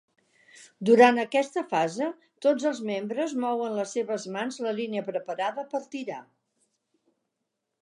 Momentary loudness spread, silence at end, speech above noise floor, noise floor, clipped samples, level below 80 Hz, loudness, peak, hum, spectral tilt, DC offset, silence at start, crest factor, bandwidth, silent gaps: 14 LU; 1.6 s; 56 dB; -82 dBFS; under 0.1%; -84 dBFS; -27 LUFS; -6 dBFS; none; -4.5 dB/octave; under 0.1%; 0.6 s; 22 dB; 11 kHz; none